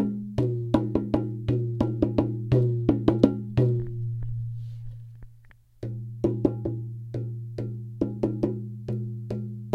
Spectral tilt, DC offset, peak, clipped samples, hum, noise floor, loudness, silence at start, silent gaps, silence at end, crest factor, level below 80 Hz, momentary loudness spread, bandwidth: -10 dB/octave; under 0.1%; -2 dBFS; under 0.1%; none; -53 dBFS; -28 LUFS; 0 s; none; 0 s; 24 dB; -46 dBFS; 12 LU; 5.6 kHz